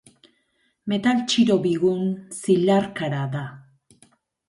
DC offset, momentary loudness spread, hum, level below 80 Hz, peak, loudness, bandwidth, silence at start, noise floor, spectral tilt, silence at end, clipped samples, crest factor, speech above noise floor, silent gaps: under 0.1%; 11 LU; none; -64 dBFS; -8 dBFS; -22 LUFS; 11.5 kHz; 0.85 s; -68 dBFS; -5.5 dB/octave; 0.9 s; under 0.1%; 16 dB; 47 dB; none